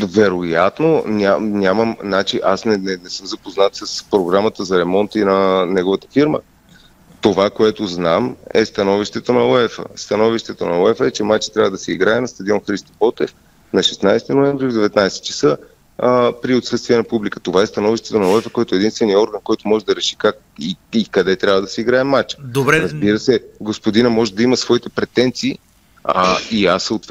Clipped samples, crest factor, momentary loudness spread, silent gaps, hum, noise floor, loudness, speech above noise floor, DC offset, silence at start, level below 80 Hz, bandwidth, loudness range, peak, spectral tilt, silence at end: under 0.1%; 16 dB; 7 LU; none; none; -47 dBFS; -16 LUFS; 31 dB; under 0.1%; 0 s; -50 dBFS; 15 kHz; 1 LU; 0 dBFS; -5 dB/octave; 0.05 s